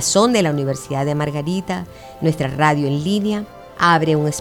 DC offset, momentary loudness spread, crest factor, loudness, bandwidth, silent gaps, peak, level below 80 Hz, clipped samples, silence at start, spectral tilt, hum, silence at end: under 0.1%; 12 LU; 18 dB; -19 LUFS; 18 kHz; none; 0 dBFS; -50 dBFS; under 0.1%; 0 s; -5 dB/octave; none; 0 s